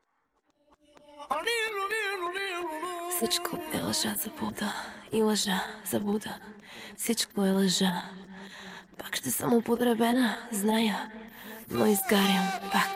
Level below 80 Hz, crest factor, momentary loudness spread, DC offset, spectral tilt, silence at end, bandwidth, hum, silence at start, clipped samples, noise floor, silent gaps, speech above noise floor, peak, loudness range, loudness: -66 dBFS; 20 dB; 18 LU; under 0.1%; -3.5 dB/octave; 0 s; 16.5 kHz; none; 1.1 s; under 0.1%; -74 dBFS; none; 46 dB; -10 dBFS; 4 LU; -29 LUFS